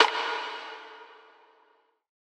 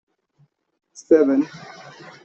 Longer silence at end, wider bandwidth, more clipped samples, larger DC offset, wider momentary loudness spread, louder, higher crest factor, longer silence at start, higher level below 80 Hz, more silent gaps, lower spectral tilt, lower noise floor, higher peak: first, 1.1 s vs 0.65 s; first, 12.5 kHz vs 8.2 kHz; neither; neither; second, 22 LU vs 25 LU; second, -30 LUFS vs -18 LUFS; first, 28 dB vs 20 dB; second, 0 s vs 1.1 s; second, under -90 dBFS vs -68 dBFS; neither; second, 1.5 dB/octave vs -6 dB/octave; first, -66 dBFS vs -62 dBFS; about the same, -2 dBFS vs -4 dBFS